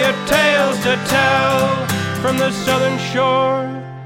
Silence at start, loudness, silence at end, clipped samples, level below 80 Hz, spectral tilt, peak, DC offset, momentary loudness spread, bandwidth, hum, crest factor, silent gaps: 0 s; -16 LUFS; 0 s; under 0.1%; -48 dBFS; -4.5 dB/octave; -2 dBFS; under 0.1%; 6 LU; 16.5 kHz; none; 14 dB; none